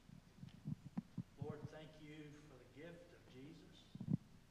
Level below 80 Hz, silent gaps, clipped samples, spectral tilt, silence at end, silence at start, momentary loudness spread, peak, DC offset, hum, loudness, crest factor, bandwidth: -72 dBFS; none; under 0.1%; -7.5 dB/octave; 0 s; 0 s; 17 LU; -26 dBFS; under 0.1%; none; -53 LUFS; 26 dB; 14.5 kHz